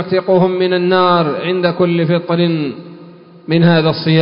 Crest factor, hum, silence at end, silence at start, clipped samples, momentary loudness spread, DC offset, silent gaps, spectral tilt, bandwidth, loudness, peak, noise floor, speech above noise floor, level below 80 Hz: 14 dB; none; 0 s; 0 s; under 0.1%; 8 LU; under 0.1%; none; -12 dB/octave; 5.4 kHz; -14 LUFS; 0 dBFS; -38 dBFS; 25 dB; -56 dBFS